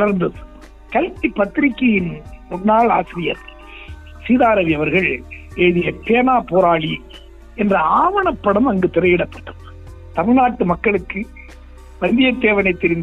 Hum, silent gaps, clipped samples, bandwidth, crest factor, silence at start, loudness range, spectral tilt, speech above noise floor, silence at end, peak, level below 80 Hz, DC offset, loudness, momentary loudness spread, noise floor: none; none; under 0.1%; 7.6 kHz; 14 dB; 0 s; 3 LU; -8 dB/octave; 22 dB; 0 s; -2 dBFS; -38 dBFS; under 0.1%; -17 LUFS; 17 LU; -38 dBFS